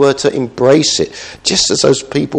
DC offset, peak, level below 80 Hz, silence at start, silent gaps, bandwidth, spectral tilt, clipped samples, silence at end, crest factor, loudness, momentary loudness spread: under 0.1%; 0 dBFS; -44 dBFS; 0 s; none; 10 kHz; -3.5 dB/octave; 0.1%; 0 s; 12 dB; -12 LUFS; 6 LU